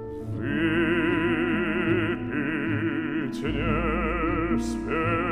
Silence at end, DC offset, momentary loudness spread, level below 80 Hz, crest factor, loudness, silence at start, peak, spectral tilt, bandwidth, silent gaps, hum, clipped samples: 0 s; under 0.1%; 5 LU; -38 dBFS; 14 dB; -26 LUFS; 0 s; -10 dBFS; -7 dB/octave; 10.5 kHz; none; none; under 0.1%